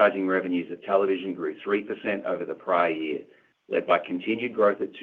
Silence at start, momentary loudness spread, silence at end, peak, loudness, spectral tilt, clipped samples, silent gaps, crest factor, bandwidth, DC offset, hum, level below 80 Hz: 0 s; 7 LU; 0 s; -6 dBFS; -26 LUFS; -8 dB/octave; under 0.1%; none; 20 dB; 4.7 kHz; under 0.1%; none; -74 dBFS